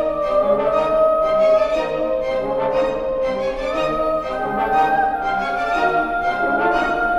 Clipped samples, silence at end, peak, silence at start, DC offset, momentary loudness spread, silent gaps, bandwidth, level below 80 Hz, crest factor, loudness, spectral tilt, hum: under 0.1%; 0 s; -6 dBFS; 0 s; under 0.1%; 5 LU; none; 12 kHz; -40 dBFS; 12 dB; -19 LUFS; -5.5 dB/octave; none